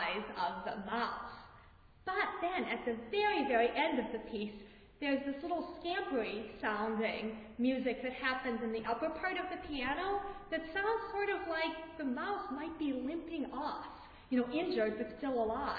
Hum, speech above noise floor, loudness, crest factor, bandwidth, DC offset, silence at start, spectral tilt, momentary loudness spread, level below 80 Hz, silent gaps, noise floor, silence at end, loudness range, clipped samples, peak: none; 24 dB; -37 LUFS; 18 dB; 4.9 kHz; under 0.1%; 0 s; -2 dB/octave; 8 LU; -62 dBFS; none; -60 dBFS; 0 s; 3 LU; under 0.1%; -18 dBFS